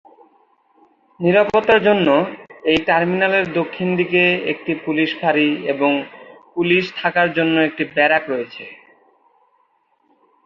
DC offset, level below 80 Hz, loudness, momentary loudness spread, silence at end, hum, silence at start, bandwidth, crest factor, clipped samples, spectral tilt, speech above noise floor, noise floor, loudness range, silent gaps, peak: under 0.1%; -58 dBFS; -17 LUFS; 11 LU; 1.7 s; none; 1.2 s; 7.2 kHz; 18 dB; under 0.1%; -7 dB/octave; 45 dB; -62 dBFS; 3 LU; none; -2 dBFS